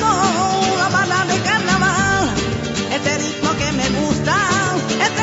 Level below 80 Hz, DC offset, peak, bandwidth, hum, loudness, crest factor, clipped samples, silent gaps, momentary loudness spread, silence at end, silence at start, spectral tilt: -38 dBFS; under 0.1%; -4 dBFS; 8.2 kHz; none; -17 LUFS; 14 dB; under 0.1%; none; 4 LU; 0 s; 0 s; -3.5 dB/octave